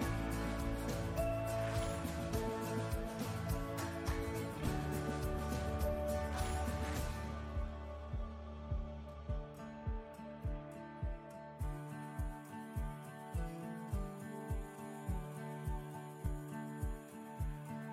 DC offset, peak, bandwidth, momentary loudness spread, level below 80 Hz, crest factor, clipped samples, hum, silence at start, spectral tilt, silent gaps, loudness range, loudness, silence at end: under 0.1%; -24 dBFS; 16 kHz; 9 LU; -46 dBFS; 16 dB; under 0.1%; none; 0 s; -6 dB/octave; none; 7 LU; -42 LUFS; 0 s